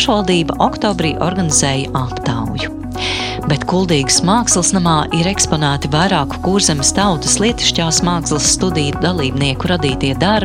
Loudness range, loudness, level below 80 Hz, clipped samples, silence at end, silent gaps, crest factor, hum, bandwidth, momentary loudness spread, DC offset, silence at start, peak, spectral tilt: 3 LU; -14 LUFS; -32 dBFS; under 0.1%; 0 s; none; 14 dB; none; 16 kHz; 7 LU; under 0.1%; 0 s; 0 dBFS; -3.5 dB/octave